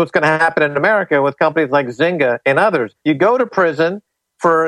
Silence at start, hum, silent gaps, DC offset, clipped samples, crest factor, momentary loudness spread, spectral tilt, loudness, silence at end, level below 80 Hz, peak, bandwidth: 0 s; none; none; under 0.1%; under 0.1%; 14 dB; 5 LU; -6.5 dB/octave; -15 LUFS; 0 s; -62 dBFS; 0 dBFS; 11.5 kHz